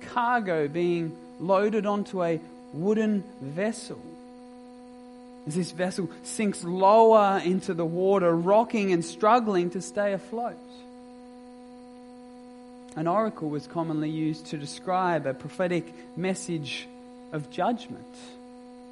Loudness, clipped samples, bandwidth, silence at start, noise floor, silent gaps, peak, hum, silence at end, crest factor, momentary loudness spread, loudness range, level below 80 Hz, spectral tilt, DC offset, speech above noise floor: -26 LUFS; under 0.1%; 11.5 kHz; 0 s; -46 dBFS; none; -6 dBFS; none; 0 s; 20 dB; 25 LU; 11 LU; -68 dBFS; -6 dB/octave; under 0.1%; 20 dB